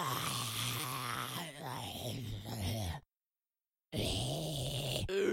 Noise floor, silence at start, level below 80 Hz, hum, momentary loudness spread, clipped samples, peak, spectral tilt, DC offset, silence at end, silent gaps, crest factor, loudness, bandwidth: under -90 dBFS; 0 s; -56 dBFS; none; 7 LU; under 0.1%; -20 dBFS; -4 dB/octave; under 0.1%; 0 s; none; 18 dB; -38 LUFS; 16.5 kHz